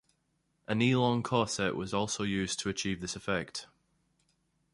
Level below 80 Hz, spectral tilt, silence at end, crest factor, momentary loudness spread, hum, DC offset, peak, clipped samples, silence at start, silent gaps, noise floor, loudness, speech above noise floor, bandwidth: -60 dBFS; -4.5 dB/octave; 1.1 s; 22 dB; 9 LU; none; under 0.1%; -12 dBFS; under 0.1%; 0.7 s; none; -77 dBFS; -31 LUFS; 45 dB; 11.5 kHz